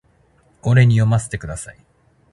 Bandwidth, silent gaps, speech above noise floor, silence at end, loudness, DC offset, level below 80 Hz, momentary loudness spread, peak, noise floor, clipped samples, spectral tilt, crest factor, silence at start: 11.5 kHz; none; 40 dB; 0.6 s; -17 LUFS; under 0.1%; -42 dBFS; 18 LU; -2 dBFS; -56 dBFS; under 0.1%; -6.5 dB/octave; 18 dB; 0.65 s